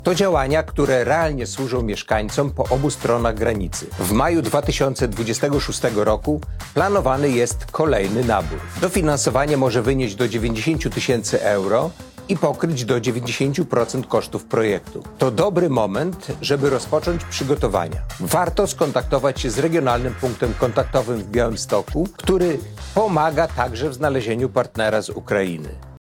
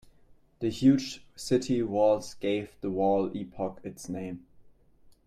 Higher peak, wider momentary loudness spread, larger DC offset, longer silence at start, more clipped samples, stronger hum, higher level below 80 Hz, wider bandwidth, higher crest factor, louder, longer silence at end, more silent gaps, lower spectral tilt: first, -4 dBFS vs -12 dBFS; second, 6 LU vs 15 LU; neither; second, 0 s vs 0.3 s; neither; neither; first, -34 dBFS vs -60 dBFS; first, 18.5 kHz vs 14 kHz; about the same, 16 dB vs 18 dB; first, -20 LUFS vs -29 LUFS; about the same, 0.2 s vs 0.15 s; neither; about the same, -5 dB/octave vs -6 dB/octave